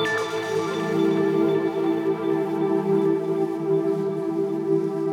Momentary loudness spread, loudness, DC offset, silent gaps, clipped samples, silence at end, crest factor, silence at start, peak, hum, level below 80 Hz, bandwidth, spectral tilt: 4 LU; -23 LUFS; under 0.1%; none; under 0.1%; 0 s; 12 dB; 0 s; -10 dBFS; none; -76 dBFS; 13 kHz; -6.5 dB/octave